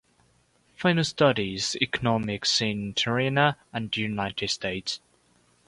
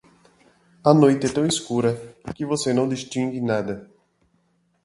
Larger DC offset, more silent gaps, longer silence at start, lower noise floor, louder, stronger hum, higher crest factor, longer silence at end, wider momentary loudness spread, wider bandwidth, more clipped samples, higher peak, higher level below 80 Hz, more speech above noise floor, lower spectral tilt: neither; neither; about the same, 0.8 s vs 0.85 s; about the same, -64 dBFS vs -66 dBFS; second, -26 LUFS vs -22 LUFS; neither; about the same, 20 dB vs 22 dB; second, 0.7 s vs 1 s; second, 8 LU vs 16 LU; about the same, 11.5 kHz vs 11.5 kHz; neither; second, -6 dBFS vs 0 dBFS; about the same, -56 dBFS vs -58 dBFS; second, 38 dB vs 45 dB; second, -4 dB/octave vs -5.5 dB/octave